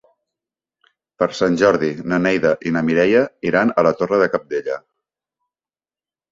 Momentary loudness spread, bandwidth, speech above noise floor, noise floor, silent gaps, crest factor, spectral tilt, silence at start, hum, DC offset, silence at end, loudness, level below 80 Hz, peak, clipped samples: 8 LU; 7.6 kHz; over 73 dB; under -90 dBFS; none; 18 dB; -6.5 dB/octave; 1.2 s; none; under 0.1%; 1.55 s; -18 LUFS; -56 dBFS; -2 dBFS; under 0.1%